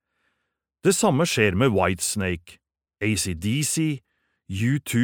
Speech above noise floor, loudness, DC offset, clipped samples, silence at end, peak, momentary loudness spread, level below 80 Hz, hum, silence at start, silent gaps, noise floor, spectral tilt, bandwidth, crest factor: 57 dB; -23 LUFS; under 0.1%; under 0.1%; 0 s; -4 dBFS; 9 LU; -52 dBFS; none; 0.85 s; none; -79 dBFS; -4.5 dB/octave; 19.5 kHz; 20 dB